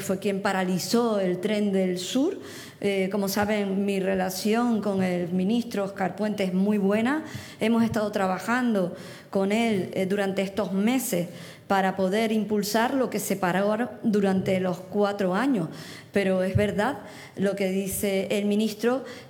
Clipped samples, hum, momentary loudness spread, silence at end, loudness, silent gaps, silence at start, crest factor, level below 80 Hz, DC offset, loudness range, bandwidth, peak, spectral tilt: under 0.1%; none; 5 LU; 0 s; -26 LUFS; none; 0 s; 16 dB; -60 dBFS; under 0.1%; 1 LU; 19.5 kHz; -10 dBFS; -5.5 dB/octave